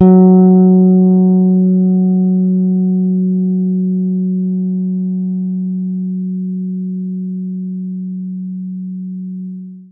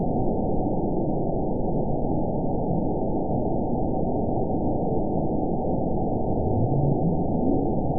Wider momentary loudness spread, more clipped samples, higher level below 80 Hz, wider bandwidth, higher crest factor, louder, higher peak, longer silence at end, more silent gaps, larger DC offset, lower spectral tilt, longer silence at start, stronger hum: first, 16 LU vs 3 LU; neither; second, -64 dBFS vs -34 dBFS; first, 1.4 kHz vs 1 kHz; about the same, 12 dB vs 14 dB; first, -14 LUFS vs -26 LUFS; first, 0 dBFS vs -10 dBFS; about the same, 0.05 s vs 0 s; neither; second, under 0.1% vs 3%; second, -16 dB/octave vs -19 dB/octave; about the same, 0 s vs 0 s; neither